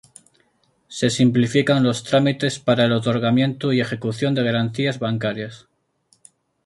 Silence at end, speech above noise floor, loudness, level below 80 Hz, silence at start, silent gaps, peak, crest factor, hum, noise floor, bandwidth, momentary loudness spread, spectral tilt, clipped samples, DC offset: 1.1 s; 44 dB; -20 LUFS; -58 dBFS; 0.9 s; none; -4 dBFS; 18 dB; none; -63 dBFS; 11.5 kHz; 7 LU; -6 dB/octave; under 0.1%; under 0.1%